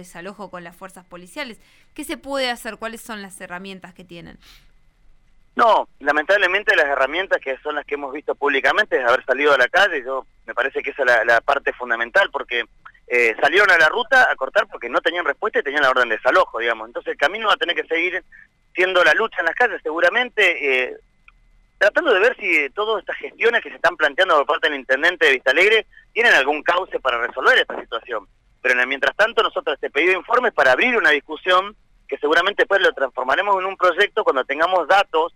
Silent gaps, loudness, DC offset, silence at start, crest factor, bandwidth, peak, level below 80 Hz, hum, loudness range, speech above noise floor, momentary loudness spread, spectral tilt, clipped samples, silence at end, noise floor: none; -18 LUFS; under 0.1%; 0 s; 14 dB; 16.5 kHz; -6 dBFS; -56 dBFS; none; 7 LU; 36 dB; 15 LU; -2.5 dB/octave; under 0.1%; 0.05 s; -55 dBFS